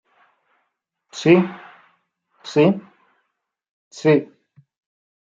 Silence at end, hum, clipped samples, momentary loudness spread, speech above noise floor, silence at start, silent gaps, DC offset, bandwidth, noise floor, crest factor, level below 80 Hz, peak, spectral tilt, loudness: 1.05 s; none; under 0.1%; 24 LU; 60 dB; 1.15 s; 3.69-3.91 s; under 0.1%; 7.8 kHz; -76 dBFS; 20 dB; -66 dBFS; -2 dBFS; -7 dB/octave; -19 LUFS